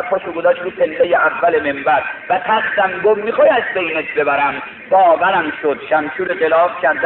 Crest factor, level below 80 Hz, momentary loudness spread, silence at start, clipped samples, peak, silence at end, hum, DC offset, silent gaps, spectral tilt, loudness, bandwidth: 14 dB; -56 dBFS; 6 LU; 0 s; under 0.1%; -2 dBFS; 0 s; none; under 0.1%; none; -1.5 dB/octave; -15 LUFS; 4.2 kHz